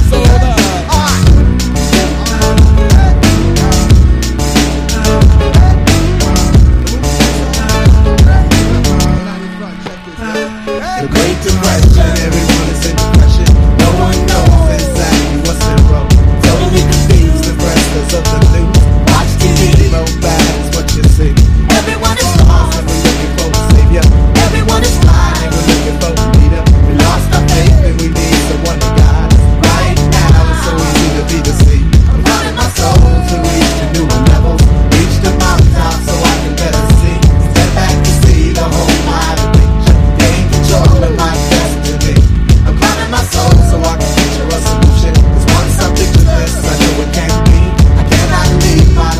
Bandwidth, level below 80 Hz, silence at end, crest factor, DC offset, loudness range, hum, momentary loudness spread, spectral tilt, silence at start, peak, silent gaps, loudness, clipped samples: 15.5 kHz; -10 dBFS; 0 s; 8 dB; under 0.1%; 1 LU; none; 5 LU; -5.5 dB/octave; 0 s; 0 dBFS; none; -9 LUFS; 3%